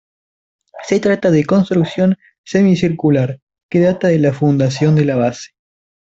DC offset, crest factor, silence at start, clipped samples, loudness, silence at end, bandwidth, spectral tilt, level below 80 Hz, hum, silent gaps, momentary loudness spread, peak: under 0.1%; 14 dB; 0.75 s; under 0.1%; -15 LUFS; 0.55 s; 7.8 kHz; -7.5 dB/octave; -52 dBFS; none; 2.38-2.44 s, 3.42-3.47 s, 3.63-3.69 s; 7 LU; -2 dBFS